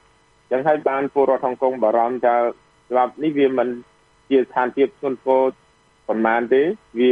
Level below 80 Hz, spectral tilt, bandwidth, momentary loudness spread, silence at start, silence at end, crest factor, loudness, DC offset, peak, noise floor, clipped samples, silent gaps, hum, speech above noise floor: -66 dBFS; -7.5 dB/octave; 4.5 kHz; 6 LU; 0.5 s; 0 s; 16 dB; -20 LUFS; under 0.1%; -4 dBFS; -57 dBFS; under 0.1%; none; none; 38 dB